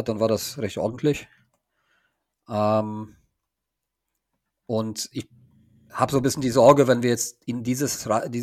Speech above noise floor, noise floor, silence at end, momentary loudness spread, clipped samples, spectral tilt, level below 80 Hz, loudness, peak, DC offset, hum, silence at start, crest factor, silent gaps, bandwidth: 61 dB; -83 dBFS; 0 s; 16 LU; under 0.1%; -5 dB/octave; -58 dBFS; -23 LUFS; -2 dBFS; under 0.1%; none; 0 s; 24 dB; none; 16 kHz